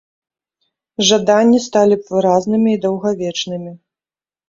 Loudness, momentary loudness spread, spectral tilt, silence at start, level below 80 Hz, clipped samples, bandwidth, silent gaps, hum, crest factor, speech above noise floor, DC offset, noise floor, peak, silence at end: -15 LUFS; 13 LU; -4.5 dB/octave; 1 s; -58 dBFS; under 0.1%; 7.8 kHz; none; none; 16 dB; over 76 dB; under 0.1%; under -90 dBFS; 0 dBFS; 0.7 s